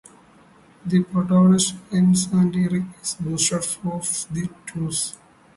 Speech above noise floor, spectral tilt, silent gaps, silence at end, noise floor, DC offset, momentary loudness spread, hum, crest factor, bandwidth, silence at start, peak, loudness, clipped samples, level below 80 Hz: 31 dB; -5 dB/octave; none; 0.45 s; -52 dBFS; under 0.1%; 12 LU; none; 16 dB; 11.5 kHz; 0.85 s; -6 dBFS; -21 LUFS; under 0.1%; -56 dBFS